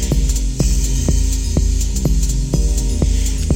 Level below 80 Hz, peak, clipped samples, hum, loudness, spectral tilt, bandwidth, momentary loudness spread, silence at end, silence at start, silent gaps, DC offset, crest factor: -16 dBFS; -2 dBFS; under 0.1%; none; -18 LUFS; -5 dB/octave; 16.5 kHz; 1 LU; 0 s; 0 s; none; under 0.1%; 12 dB